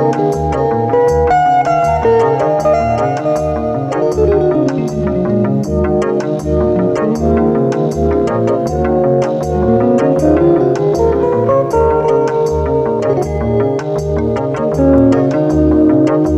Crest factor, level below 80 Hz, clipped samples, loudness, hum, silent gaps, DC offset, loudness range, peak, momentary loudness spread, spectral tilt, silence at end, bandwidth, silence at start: 12 dB; -28 dBFS; under 0.1%; -13 LUFS; none; none; under 0.1%; 2 LU; 0 dBFS; 5 LU; -8 dB/octave; 0 s; 13 kHz; 0 s